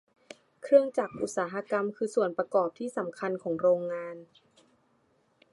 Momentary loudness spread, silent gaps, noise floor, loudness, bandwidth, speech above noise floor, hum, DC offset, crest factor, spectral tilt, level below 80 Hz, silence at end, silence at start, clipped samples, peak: 12 LU; none; -69 dBFS; -29 LUFS; 11.5 kHz; 41 dB; none; under 0.1%; 22 dB; -5.5 dB/octave; -76 dBFS; 1.3 s; 0.6 s; under 0.1%; -8 dBFS